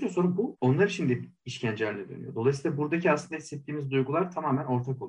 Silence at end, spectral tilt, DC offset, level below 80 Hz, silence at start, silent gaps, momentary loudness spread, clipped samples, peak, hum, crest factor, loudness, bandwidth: 0 s; -7 dB/octave; under 0.1%; -68 dBFS; 0 s; none; 12 LU; under 0.1%; -12 dBFS; none; 16 dB; -29 LUFS; 10.5 kHz